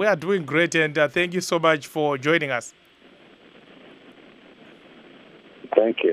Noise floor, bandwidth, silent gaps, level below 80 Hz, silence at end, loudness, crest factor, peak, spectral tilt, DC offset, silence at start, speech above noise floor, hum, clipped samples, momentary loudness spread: -52 dBFS; 15 kHz; none; -68 dBFS; 0 s; -22 LUFS; 24 dB; -2 dBFS; -4.5 dB/octave; under 0.1%; 0 s; 30 dB; none; under 0.1%; 5 LU